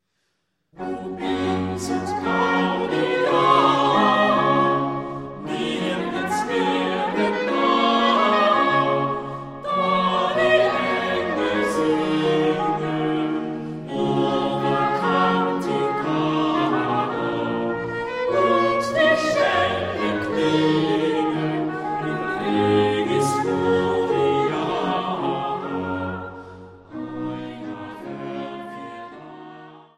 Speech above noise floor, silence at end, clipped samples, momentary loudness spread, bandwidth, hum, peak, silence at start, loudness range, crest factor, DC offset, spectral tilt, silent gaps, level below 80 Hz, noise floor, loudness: 47 dB; 0.2 s; under 0.1%; 14 LU; 13.5 kHz; none; -4 dBFS; 0.75 s; 6 LU; 18 dB; under 0.1%; -5.5 dB/octave; none; -56 dBFS; -73 dBFS; -21 LUFS